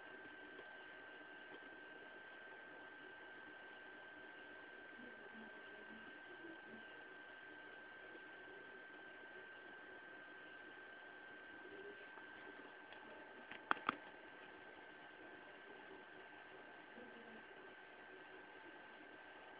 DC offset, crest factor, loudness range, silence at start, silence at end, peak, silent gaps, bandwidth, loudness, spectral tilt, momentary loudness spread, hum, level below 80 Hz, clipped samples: under 0.1%; 38 dB; 7 LU; 0 s; 0 s; -18 dBFS; none; 4 kHz; -55 LUFS; -0.5 dB/octave; 2 LU; none; -88 dBFS; under 0.1%